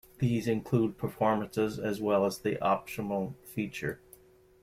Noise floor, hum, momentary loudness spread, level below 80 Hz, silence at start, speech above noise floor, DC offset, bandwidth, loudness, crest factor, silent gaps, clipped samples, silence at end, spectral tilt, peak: -58 dBFS; none; 9 LU; -60 dBFS; 0.2 s; 28 dB; under 0.1%; 16 kHz; -31 LUFS; 18 dB; none; under 0.1%; 0.65 s; -7 dB/octave; -14 dBFS